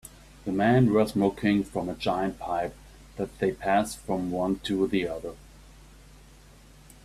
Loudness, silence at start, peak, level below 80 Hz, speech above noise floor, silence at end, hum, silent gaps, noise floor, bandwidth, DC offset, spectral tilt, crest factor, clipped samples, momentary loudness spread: -27 LUFS; 0.05 s; -10 dBFS; -52 dBFS; 26 dB; 1.65 s; none; none; -52 dBFS; 14.5 kHz; under 0.1%; -6.5 dB/octave; 18 dB; under 0.1%; 14 LU